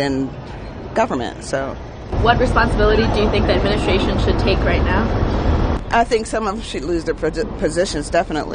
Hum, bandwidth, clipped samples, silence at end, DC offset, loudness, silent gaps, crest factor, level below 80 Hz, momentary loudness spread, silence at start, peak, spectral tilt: none; 10 kHz; under 0.1%; 0 s; under 0.1%; -18 LUFS; none; 18 dB; -24 dBFS; 9 LU; 0 s; 0 dBFS; -6 dB/octave